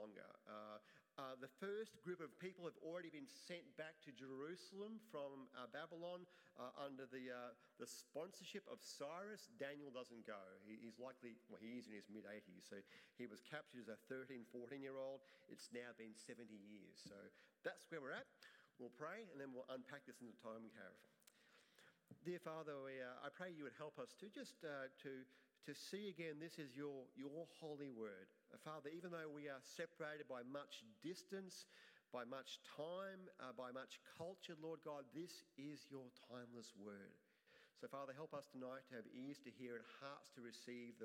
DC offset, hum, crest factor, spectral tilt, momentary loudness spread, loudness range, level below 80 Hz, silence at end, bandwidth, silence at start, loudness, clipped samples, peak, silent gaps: under 0.1%; none; 22 dB; -4.5 dB/octave; 8 LU; 3 LU; under -90 dBFS; 0 s; 16 kHz; 0 s; -56 LUFS; under 0.1%; -34 dBFS; none